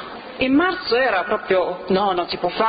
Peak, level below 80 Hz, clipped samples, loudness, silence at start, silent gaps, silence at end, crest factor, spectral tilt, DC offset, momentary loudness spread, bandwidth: -6 dBFS; -52 dBFS; under 0.1%; -20 LUFS; 0 s; none; 0 s; 14 dB; -8.5 dB/octave; under 0.1%; 6 LU; 5 kHz